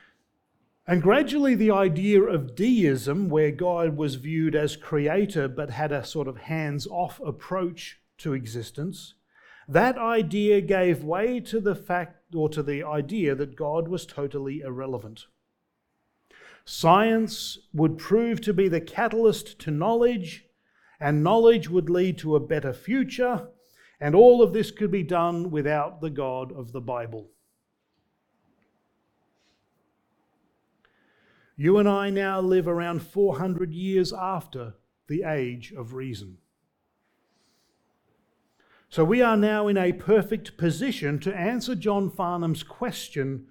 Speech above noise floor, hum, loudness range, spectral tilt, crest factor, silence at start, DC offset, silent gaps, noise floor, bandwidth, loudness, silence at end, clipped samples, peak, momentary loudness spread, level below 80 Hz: 53 dB; none; 11 LU; -6.5 dB/octave; 22 dB; 0.85 s; under 0.1%; none; -77 dBFS; 18.5 kHz; -24 LUFS; 0.1 s; under 0.1%; -4 dBFS; 13 LU; -58 dBFS